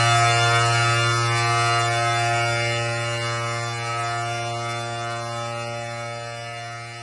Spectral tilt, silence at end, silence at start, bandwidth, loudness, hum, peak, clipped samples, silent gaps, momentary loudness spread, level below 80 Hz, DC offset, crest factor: -3.5 dB/octave; 0 s; 0 s; 11 kHz; -22 LUFS; none; -4 dBFS; under 0.1%; none; 13 LU; -56 dBFS; under 0.1%; 18 dB